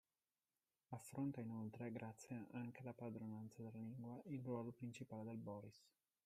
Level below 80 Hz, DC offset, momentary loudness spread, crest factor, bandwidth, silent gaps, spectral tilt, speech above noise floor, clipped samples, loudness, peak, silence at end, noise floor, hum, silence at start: -88 dBFS; under 0.1%; 7 LU; 16 dB; 15 kHz; none; -7.5 dB/octave; over 38 dB; under 0.1%; -52 LUFS; -36 dBFS; 0.35 s; under -90 dBFS; none; 0.9 s